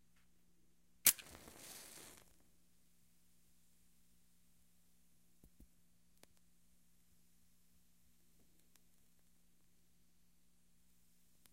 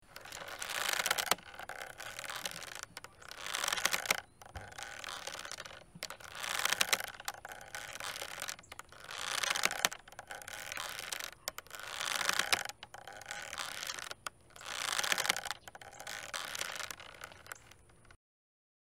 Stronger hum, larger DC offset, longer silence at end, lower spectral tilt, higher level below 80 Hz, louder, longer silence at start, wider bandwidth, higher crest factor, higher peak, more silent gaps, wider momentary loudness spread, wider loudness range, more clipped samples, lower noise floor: neither; neither; first, 10.4 s vs 0.8 s; about the same, 1 dB/octave vs 0.5 dB/octave; second, -78 dBFS vs -68 dBFS; first, -34 LUFS vs -37 LUFS; first, 1.05 s vs 0.1 s; about the same, 16 kHz vs 17 kHz; first, 40 dB vs 32 dB; about the same, -10 dBFS vs -8 dBFS; neither; first, 24 LU vs 17 LU; first, 20 LU vs 1 LU; neither; first, -77 dBFS vs -61 dBFS